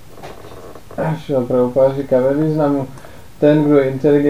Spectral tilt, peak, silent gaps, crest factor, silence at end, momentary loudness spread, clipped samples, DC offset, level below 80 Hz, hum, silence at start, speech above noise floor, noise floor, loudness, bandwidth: -8.5 dB/octave; 0 dBFS; none; 16 dB; 0 s; 22 LU; under 0.1%; 1%; -46 dBFS; none; 0.2 s; 22 dB; -36 dBFS; -16 LUFS; 15.5 kHz